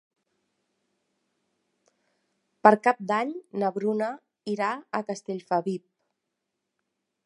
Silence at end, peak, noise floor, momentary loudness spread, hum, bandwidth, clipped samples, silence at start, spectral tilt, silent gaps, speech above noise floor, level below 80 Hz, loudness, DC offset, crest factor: 1.45 s; -2 dBFS; -82 dBFS; 14 LU; none; 11 kHz; under 0.1%; 2.65 s; -6 dB/octave; none; 57 dB; -82 dBFS; -26 LUFS; under 0.1%; 28 dB